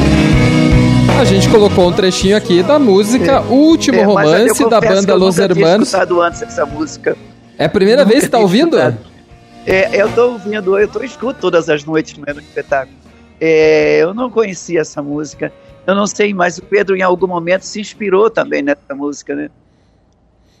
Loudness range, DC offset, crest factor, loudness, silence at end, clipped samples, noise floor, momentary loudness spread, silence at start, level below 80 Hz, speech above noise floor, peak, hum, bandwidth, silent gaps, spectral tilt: 6 LU; under 0.1%; 12 dB; -12 LUFS; 1.15 s; under 0.1%; -52 dBFS; 13 LU; 0 s; -30 dBFS; 40 dB; 0 dBFS; none; 15.5 kHz; none; -5.5 dB/octave